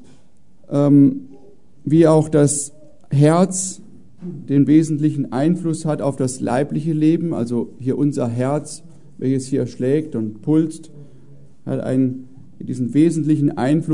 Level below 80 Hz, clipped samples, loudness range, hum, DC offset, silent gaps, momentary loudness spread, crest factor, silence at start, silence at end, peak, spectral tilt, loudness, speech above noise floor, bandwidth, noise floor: -60 dBFS; under 0.1%; 6 LU; none; 1%; none; 16 LU; 16 dB; 0.7 s; 0 s; -2 dBFS; -7 dB/octave; -18 LUFS; 37 dB; 11 kHz; -55 dBFS